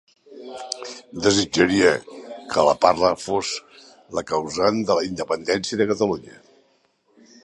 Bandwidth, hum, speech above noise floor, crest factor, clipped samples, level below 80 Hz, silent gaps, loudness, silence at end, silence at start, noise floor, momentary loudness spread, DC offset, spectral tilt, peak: 11.5 kHz; none; 43 dB; 22 dB; under 0.1%; -54 dBFS; none; -21 LUFS; 1.1 s; 0.3 s; -63 dBFS; 15 LU; under 0.1%; -4 dB/octave; 0 dBFS